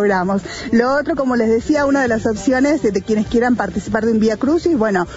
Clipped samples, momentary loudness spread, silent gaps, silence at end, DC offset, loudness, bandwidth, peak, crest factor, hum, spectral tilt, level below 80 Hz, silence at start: under 0.1%; 4 LU; none; 0 s; under 0.1%; -16 LUFS; 8 kHz; -2 dBFS; 14 dB; none; -6 dB/octave; -40 dBFS; 0 s